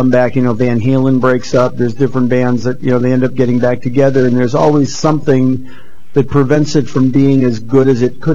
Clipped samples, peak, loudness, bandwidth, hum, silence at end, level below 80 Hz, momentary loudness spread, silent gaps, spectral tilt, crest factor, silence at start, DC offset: under 0.1%; 0 dBFS; -12 LUFS; 7.6 kHz; none; 0 s; -44 dBFS; 4 LU; none; -7.5 dB/octave; 12 dB; 0 s; 10%